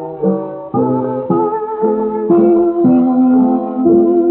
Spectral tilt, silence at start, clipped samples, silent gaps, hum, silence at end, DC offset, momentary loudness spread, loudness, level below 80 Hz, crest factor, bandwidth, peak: -11 dB/octave; 0 s; under 0.1%; none; none; 0 s; under 0.1%; 7 LU; -13 LUFS; -52 dBFS; 12 dB; 2.8 kHz; 0 dBFS